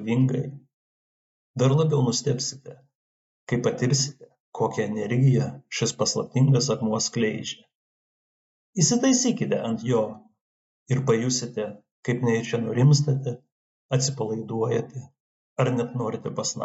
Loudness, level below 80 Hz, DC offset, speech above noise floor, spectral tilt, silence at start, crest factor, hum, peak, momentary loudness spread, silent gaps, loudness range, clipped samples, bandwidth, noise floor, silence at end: -24 LUFS; -66 dBFS; under 0.1%; over 66 dB; -5 dB/octave; 0 s; 18 dB; none; -8 dBFS; 13 LU; 0.74-1.54 s, 2.95-3.47 s, 4.40-4.52 s, 7.75-8.73 s, 10.41-10.86 s, 11.91-12.03 s, 13.52-13.89 s, 15.20-15.56 s; 3 LU; under 0.1%; 8.2 kHz; under -90 dBFS; 0 s